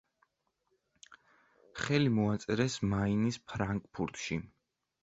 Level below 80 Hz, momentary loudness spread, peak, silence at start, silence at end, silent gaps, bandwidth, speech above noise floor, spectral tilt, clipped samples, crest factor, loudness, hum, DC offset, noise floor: -58 dBFS; 10 LU; -14 dBFS; 1.1 s; 0.55 s; none; 8 kHz; 47 dB; -6 dB/octave; under 0.1%; 20 dB; -33 LUFS; none; under 0.1%; -80 dBFS